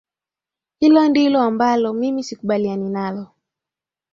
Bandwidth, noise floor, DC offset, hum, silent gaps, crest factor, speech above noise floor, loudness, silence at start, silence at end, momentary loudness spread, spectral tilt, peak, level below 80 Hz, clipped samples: 7.4 kHz; -89 dBFS; under 0.1%; none; none; 16 dB; 72 dB; -18 LUFS; 0.8 s; 0.9 s; 11 LU; -6 dB/octave; -2 dBFS; -64 dBFS; under 0.1%